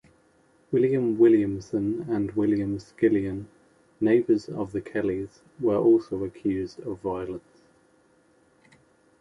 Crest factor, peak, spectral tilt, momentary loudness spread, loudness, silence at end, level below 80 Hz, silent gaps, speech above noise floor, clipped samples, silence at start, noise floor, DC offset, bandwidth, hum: 18 dB; -8 dBFS; -8.5 dB/octave; 13 LU; -25 LUFS; 1.8 s; -56 dBFS; none; 37 dB; under 0.1%; 0.7 s; -62 dBFS; under 0.1%; 7.6 kHz; none